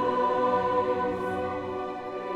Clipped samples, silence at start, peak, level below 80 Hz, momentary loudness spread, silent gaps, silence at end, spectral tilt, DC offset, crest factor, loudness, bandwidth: under 0.1%; 0 s; -14 dBFS; -58 dBFS; 9 LU; none; 0 s; -7 dB/octave; under 0.1%; 14 dB; -28 LUFS; 9.4 kHz